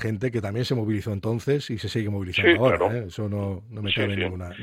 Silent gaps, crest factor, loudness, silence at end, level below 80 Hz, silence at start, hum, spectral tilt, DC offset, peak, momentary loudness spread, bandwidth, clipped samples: none; 22 dB; -25 LUFS; 0 s; -52 dBFS; 0 s; none; -6.5 dB/octave; under 0.1%; -4 dBFS; 10 LU; 15 kHz; under 0.1%